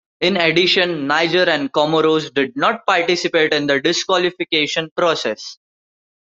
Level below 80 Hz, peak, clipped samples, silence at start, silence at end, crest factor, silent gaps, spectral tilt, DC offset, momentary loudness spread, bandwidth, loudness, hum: -62 dBFS; -2 dBFS; under 0.1%; 0.2 s; 0.65 s; 16 dB; 4.91-4.96 s; -3.5 dB/octave; under 0.1%; 5 LU; 7.8 kHz; -16 LUFS; none